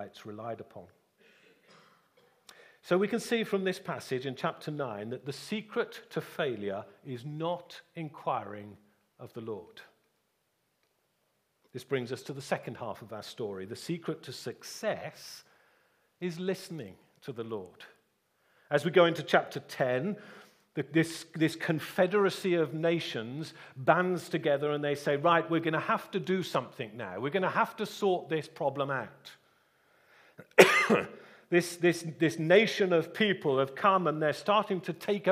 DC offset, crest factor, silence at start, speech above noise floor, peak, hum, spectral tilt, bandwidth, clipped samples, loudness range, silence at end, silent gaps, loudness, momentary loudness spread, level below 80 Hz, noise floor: under 0.1%; 30 dB; 0 s; 46 dB; -2 dBFS; none; -5 dB/octave; 15.5 kHz; under 0.1%; 13 LU; 0 s; none; -30 LUFS; 17 LU; -80 dBFS; -77 dBFS